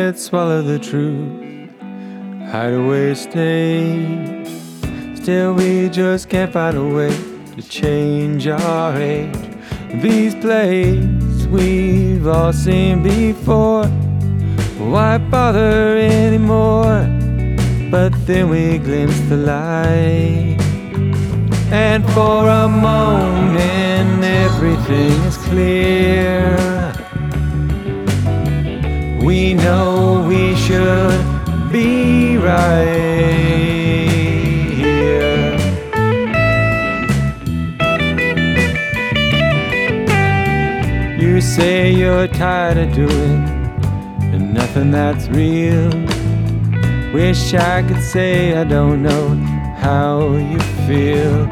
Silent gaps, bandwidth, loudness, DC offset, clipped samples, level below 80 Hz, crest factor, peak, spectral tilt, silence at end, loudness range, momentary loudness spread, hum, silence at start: none; 15 kHz; -15 LUFS; under 0.1%; under 0.1%; -26 dBFS; 14 dB; 0 dBFS; -7 dB/octave; 0 s; 4 LU; 7 LU; none; 0 s